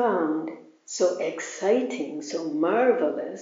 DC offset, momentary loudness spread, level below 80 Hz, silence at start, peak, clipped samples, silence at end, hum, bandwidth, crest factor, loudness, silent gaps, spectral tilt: under 0.1%; 10 LU; under -90 dBFS; 0 s; -8 dBFS; under 0.1%; 0 s; none; 7.6 kHz; 16 dB; -26 LUFS; none; -3.5 dB/octave